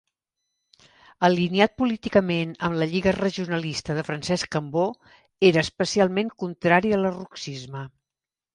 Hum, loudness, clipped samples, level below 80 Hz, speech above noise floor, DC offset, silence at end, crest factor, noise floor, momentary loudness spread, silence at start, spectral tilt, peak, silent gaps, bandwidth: none; -23 LUFS; under 0.1%; -54 dBFS; over 67 dB; under 0.1%; 0.65 s; 22 dB; under -90 dBFS; 14 LU; 1.2 s; -5.5 dB/octave; -2 dBFS; none; 11 kHz